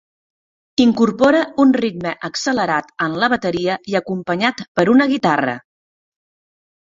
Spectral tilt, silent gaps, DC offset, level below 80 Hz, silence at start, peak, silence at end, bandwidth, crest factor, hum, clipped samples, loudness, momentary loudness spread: -5 dB/octave; 4.68-4.75 s; under 0.1%; -56 dBFS; 0.8 s; -2 dBFS; 1.25 s; 7.8 kHz; 16 dB; none; under 0.1%; -17 LUFS; 9 LU